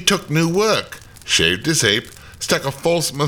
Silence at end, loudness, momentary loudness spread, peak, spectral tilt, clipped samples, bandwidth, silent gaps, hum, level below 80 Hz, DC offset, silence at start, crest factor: 0 s; -17 LUFS; 8 LU; 0 dBFS; -3 dB/octave; under 0.1%; 19.5 kHz; none; none; -46 dBFS; 0.1%; 0 s; 18 dB